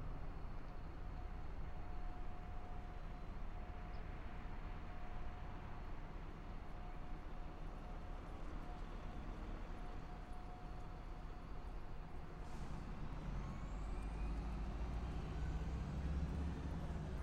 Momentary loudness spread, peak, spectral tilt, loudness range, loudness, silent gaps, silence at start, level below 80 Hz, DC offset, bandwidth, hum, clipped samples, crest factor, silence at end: 8 LU; -32 dBFS; -7.5 dB/octave; 7 LU; -50 LUFS; none; 0 s; -48 dBFS; under 0.1%; 9.2 kHz; none; under 0.1%; 14 dB; 0 s